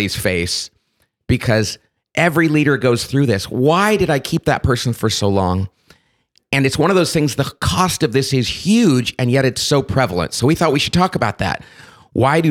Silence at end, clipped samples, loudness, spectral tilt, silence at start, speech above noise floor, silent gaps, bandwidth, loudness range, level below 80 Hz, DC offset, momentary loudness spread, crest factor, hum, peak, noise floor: 0 s; under 0.1%; -16 LUFS; -5 dB/octave; 0 s; 49 dB; none; 17 kHz; 2 LU; -40 dBFS; under 0.1%; 7 LU; 16 dB; none; -2 dBFS; -65 dBFS